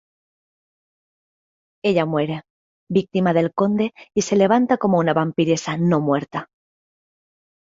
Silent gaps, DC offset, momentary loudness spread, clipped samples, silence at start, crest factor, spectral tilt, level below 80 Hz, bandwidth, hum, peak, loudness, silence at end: 2.50-2.87 s; under 0.1%; 8 LU; under 0.1%; 1.85 s; 18 dB; -6 dB/octave; -62 dBFS; 7.8 kHz; none; -4 dBFS; -20 LUFS; 1.3 s